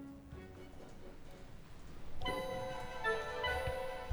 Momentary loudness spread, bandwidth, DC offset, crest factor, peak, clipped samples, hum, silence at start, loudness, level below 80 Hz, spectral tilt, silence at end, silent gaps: 18 LU; over 20 kHz; under 0.1%; 18 dB; -22 dBFS; under 0.1%; none; 0 s; -40 LUFS; -52 dBFS; -4.5 dB/octave; 0 s; none